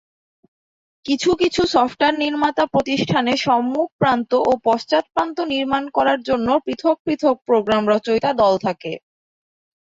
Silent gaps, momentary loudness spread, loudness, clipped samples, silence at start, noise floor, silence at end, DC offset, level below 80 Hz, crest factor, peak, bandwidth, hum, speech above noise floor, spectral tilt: 3.92-3.99 s, 7.00-7.05 s; 5 LU; -19 LUFS; under 0.1%; 1.05 s; under -90 dBFS; 0.8 s; under 0.1%; -52 dBFS; 16 dB; -4 dBFS; 8 kHz; none; over 72 dB; -5 dB/octave